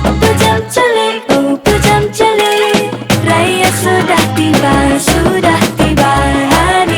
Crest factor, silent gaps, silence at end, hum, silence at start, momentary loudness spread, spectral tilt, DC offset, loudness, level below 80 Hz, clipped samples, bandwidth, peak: 10 dB; none; 0 s; none; 0 s; 3 LU; -4.5 dB/octave; under 0.1%; -10 LUFS; -26 dBFS; under 0.1%; over 20 kHz; 0 dBFS